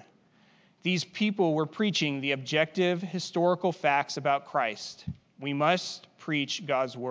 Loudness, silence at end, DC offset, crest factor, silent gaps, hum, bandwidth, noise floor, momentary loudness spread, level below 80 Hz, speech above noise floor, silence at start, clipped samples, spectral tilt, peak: -28 LUFS; 0 s; under 0.1%; 20 dB; none; none; 8 kHz; -62 dBFS; 11 LU; -64 dBFS; 34 dB; 0.85 s; under 0.1%; -5 dB/octave; -8 dBFS